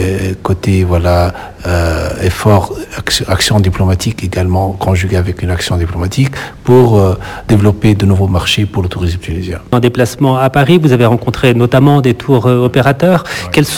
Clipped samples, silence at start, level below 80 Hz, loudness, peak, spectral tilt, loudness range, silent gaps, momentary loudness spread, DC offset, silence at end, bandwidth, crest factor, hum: 0.7%; 0 s; -24 dBFS; -11 LUFS; 0 dBFS; -6 dB/octave; 3 LU; none; 8 LU; under 0.1%; 0 s; 16 kHz; 10 dB; none